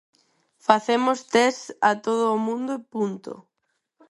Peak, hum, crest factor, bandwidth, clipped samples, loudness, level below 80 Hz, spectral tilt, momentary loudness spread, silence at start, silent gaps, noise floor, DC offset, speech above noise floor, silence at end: 0 dBFS; none; 24 dB; 11.5 kHz; under 0.1%; -23 LUFS; -70 dBFS; -4 dB/octave; 10 LU; 0.7 s; none; -76 dBFS; under 0.1%; 54 dB; 0.7 s